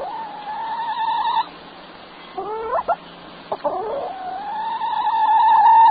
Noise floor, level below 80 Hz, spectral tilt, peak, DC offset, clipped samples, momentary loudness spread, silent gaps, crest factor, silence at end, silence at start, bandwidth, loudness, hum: -40 dBFS; -60 dBFS; -7.5 dB/octave; -6 dBFS; under 0.1%; under 0.1%; 25 LU; none; 14 dB; 0 s; 0 s; 4.9 kHz; -20 LUFS; none